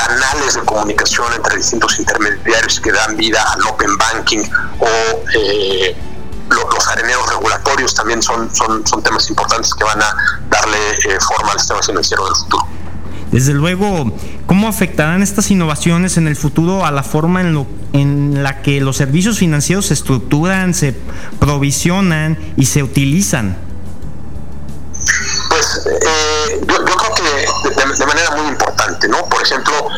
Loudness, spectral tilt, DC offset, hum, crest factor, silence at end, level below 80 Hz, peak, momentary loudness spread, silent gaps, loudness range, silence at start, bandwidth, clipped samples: -13 LUFS; -3.5 dB/octave; 7%; none; 14 dB; 0 s; -32 dBFS; 0 dBFS; 6 LU; none; 2 LU; 0 s; 17 kHz; under 0.1%